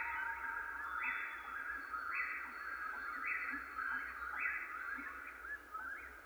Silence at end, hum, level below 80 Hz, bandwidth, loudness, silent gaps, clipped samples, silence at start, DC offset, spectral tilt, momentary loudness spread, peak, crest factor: 0 s; none; -68 dBFS; over 20 kHz; -42 LUFS; none; under 0.1%; 0 s; under 0.1%; -3 dB/octave; 7 LU; -26 dBFS; 18 dB